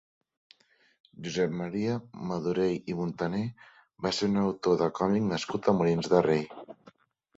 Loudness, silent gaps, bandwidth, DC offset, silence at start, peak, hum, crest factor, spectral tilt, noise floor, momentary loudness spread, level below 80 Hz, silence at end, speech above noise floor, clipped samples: -29 LUFS; none; 8 kHz; under 0.1%; 1.2 s; -8 dBFS; none; 22 dB; -6.5 dB/octave; -60 dBFS; 11 LU; -62 dBFS; 0.65 s; 31 dB; under 0.1%